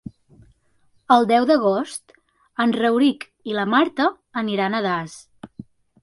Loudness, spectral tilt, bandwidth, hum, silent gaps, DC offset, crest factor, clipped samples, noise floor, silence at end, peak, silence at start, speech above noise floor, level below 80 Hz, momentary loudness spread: -20 LUFS; -5 dB/octave; 11.5 kHz; none; none; under 0.1%; 20 dB; under 0.1%; -61 dBFS; 0.4 s; 0 dBFS; 1.1 s; 42 dB; -62 dBFS; 22 LU